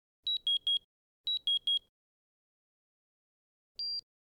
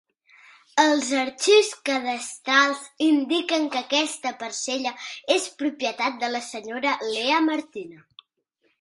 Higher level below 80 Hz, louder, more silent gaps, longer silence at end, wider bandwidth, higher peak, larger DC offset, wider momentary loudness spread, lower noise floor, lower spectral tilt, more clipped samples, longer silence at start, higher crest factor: about the same, -78 dBFS vs -76 dBFS; second, -32 LUFS vs -23 LUFS; first, 0.84-1.24 s, 1.89-3.75 s vs none; second, 0.3 s vs 0.85 s; first, 15 kHz vs 11.5 kHz; second, -24 dBFS vs -4 dBFS; neither; about the same, 11 LU vs 11 LU; first, under -90 dBFS vs -71 dBFS; second, 2 dB/octave vs -1 dB/octave; neither; second, 0.25 s vs 0.75 s; second, 12 dB vs 20 dB